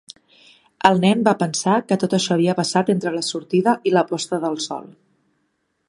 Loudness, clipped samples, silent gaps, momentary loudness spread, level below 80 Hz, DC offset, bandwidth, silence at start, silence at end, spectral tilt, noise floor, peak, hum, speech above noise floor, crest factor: -19 LUFS; under 0.1%; none; 8 LU; -66 dBFS; under 0.1%; 11.5 kHz; 0.85 s; 1.05 s; -5 dB/octave; -70 dBFS; 0 dBFS; none; 51 dB; 20 dB